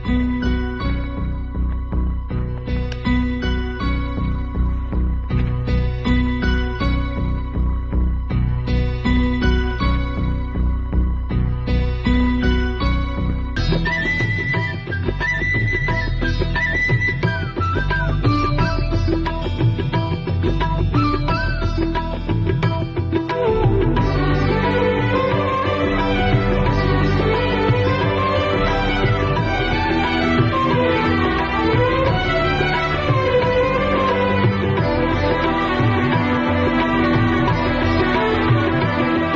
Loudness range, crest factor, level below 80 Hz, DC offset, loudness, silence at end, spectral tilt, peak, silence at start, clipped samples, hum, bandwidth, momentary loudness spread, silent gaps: 4 LU; 16 dB; -24 dBFS; under 0.1%; -19 LUFS; 0 s; -7.5 dB/octave; -2 dBFS; 0 s; under 0.1%; none; 7.2 kHz; 6 LU; none